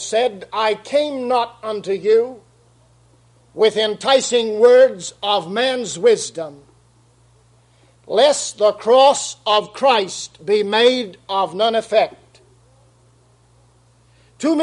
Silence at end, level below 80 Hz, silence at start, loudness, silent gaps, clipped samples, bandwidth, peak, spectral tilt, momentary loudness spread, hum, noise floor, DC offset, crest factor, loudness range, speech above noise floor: 0 s; -64 dBFS; 0 s; -17 LUFS; none; under 0.1%; 11 kHz; 0 dBFS; -2.5 dB/octave; 11 LU; none; -54 dBFS; under 0.1%; 18 dB; 5 LU; 37 dB